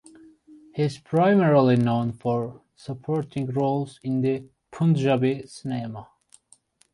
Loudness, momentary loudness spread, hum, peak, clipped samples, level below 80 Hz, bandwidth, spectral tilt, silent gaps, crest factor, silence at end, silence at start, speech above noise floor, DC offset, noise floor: -24 LUFS; 18 LU; none; -8 dBFS; under 0.1%; -62 dBFS; 11.5 kHz; -8 dB/octave; none; 16 dB; 0.9 s; 0.5 s; 37 dB; under 0.1%; -60 dBFS